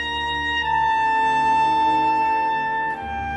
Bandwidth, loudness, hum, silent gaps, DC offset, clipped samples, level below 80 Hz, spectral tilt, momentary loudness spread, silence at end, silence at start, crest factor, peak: 9 kHz; -20 LUFS; none; none; under 0.1%; under 0.1%; -46 dBFS; -4 dB/octave; 5 LU; 0 s; 0 s; 10 dB; -10 dBFS